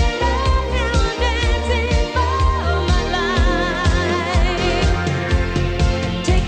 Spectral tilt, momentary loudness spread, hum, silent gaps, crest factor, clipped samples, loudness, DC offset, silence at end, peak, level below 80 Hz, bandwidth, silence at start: -5.5 dB/octave; 2 LU; none; none; 14 dB; under 0.1%; -18 LUFS; under 0.1%; 0 s; -4 dBFS; -20 dBFS; 9.2 kHz; 0 s